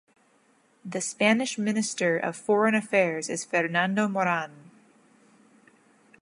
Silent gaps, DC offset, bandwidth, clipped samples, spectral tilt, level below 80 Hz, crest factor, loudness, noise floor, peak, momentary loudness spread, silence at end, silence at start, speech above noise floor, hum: none; under 0.1%; 11.5 kHz; under 0.1%; -4 dB/octave; -80 dBFS; 20 dB; -26 LUFS; -64 dBFS; -6 dBFS; 9 LU; 1.6 s; 0.85 s; 38 dB; none